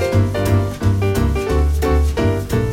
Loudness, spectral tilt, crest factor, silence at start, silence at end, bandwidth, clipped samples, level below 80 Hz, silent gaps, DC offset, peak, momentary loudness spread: -18 LUFS; -7 dB/octave; 12 dB; 0 s; 0 s; 16.5 kHz; under 0.1%; -22 dBFS; none; under 0.1%; -4 dBFS; 2 LU